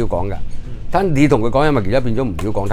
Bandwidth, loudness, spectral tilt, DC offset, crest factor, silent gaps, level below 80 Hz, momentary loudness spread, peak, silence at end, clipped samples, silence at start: 10.5 kHz; -17 LUFS; -7.5 dB/octave; under 0.1%; 16 dB; none; -26 dBFS; 15 LU; 0 dBFS; 0 s; under 0.1%; 0 s